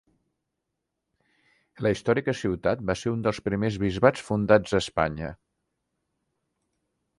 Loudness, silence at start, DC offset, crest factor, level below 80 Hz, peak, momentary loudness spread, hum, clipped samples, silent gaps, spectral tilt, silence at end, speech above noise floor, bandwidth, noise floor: -25 LUFS; 1.8 s; under 0.1%; 22 dB; -50 dBFS; -6 dBFS; 7 LU; none; under 0.1%; none; -6 dB/octave; 1.85 s; 58 dB; 11.5 kHz; -82 dBFS